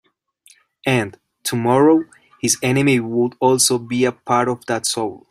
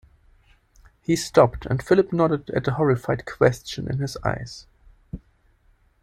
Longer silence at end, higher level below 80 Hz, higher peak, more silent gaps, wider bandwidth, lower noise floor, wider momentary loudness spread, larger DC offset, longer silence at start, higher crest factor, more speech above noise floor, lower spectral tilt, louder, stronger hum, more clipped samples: second, 0.15 s vs 0.85 s; second, -58 dBFS vs -46 dBFS; about the same, -2 dBFS vs -2 dBFS; neither; first, 16 kHz vs 14.5 kHz; second, -54 dBFS vs -60 dBFS; second, 10 LU vs 22 LU; neither; second, 0.85 s vs 1.1 s; about the same, 18 dB vs 22 dB; about the same, 37 dB vs 39 dB; second, -4 dB/octave vs -6.5 dB/octave; first, -18 LUFS vs -22 LUFS; neither; neither